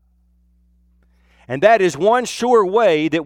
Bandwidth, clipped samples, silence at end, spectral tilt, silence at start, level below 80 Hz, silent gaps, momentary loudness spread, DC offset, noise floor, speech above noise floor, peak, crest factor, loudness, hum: 14 kHz; under 0.1%; 0 s; -4.5 dB/octave; 1.5 s; -56 dBFS; none; 4 LU; under 0.1%; -57 dBFS; 42 dB; -2 dBFS; 16 dB; -15 LUFS; none